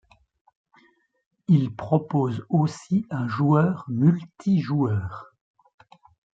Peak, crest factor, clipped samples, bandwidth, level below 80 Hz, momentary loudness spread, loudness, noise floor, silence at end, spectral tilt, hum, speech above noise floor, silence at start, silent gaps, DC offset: -6 dBFS; 18 dB; under 0.1%; 7.8 kHz; -62 dBFS; 7 LU; -23 LUFS; -61 dBFS; 1.1 s; -9 dB/octave; none; 39 dB; 1.5 s; none; under 0.1%